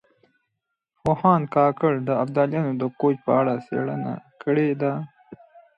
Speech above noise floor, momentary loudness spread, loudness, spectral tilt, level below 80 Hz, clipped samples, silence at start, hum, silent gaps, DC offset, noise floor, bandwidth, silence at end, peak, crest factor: 58 dB; 11 LU; -23 LUFS; -10 dB/octave; -60 dBFS; under 0.1%; 1.05 s; none; none; under 0.1%; -79 dBFS; 8 kHz; 0.2 s; -4 dBFS; 20 dB